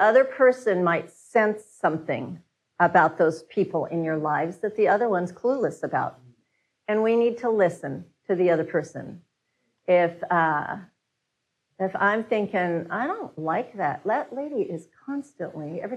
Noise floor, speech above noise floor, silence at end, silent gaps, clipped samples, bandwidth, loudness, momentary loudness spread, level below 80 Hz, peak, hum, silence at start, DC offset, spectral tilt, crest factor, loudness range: -79 dBFS; 55 dB; 0 s; none; under 0.1%; 11 kHz; -25 LUFS; 14 LU; -76 dBFS; -6 dBFS; none; 0 s; under 0.1%; -7 dB/octave; 18 dB; 4 LU